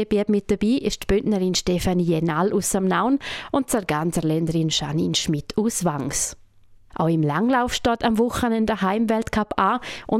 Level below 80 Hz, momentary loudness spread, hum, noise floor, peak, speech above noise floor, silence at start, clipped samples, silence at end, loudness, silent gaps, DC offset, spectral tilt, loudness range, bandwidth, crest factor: -42 dBFS; 4 LU; none; -50 dBFS; -6 dBFS; 29 dB; 0 s; under 0.1%; 0 s; -22 LUFS; none; under 0.1%; -5 dB/octave; 2 LU; 16 kHz; 16 dB